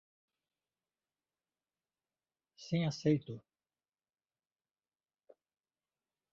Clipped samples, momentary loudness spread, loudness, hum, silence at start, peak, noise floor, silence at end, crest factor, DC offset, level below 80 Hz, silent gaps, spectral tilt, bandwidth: under 0.1%; 18 LU; -35 LUFS; none; 2.6 s; -18 dBFS; under -90 dBFS; 2.95 s; 24 dB; under 0.1%; -76 dBFS; none; -7 dB/octave; 7.4 kHz